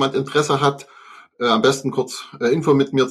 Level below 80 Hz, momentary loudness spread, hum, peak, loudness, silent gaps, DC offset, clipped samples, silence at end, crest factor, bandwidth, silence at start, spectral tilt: -60 dBFS; 8 LU; none; -4 dBFS; -19 LUFS; none; under 0.1%; under 0.1%; 0 s; 16 dB; 14 kHz; 0 s; -5 dB/octave